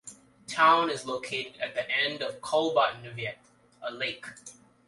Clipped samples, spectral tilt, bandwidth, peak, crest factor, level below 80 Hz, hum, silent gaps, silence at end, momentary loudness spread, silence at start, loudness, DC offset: under 0.1%; -3 dB/octave; 11.5 kHz; -10 dBFS; 20 dB; -72 dBFS; none; none; 0.35 s; 21 LU; 0.05 s; -28 LUFS; under 0.1%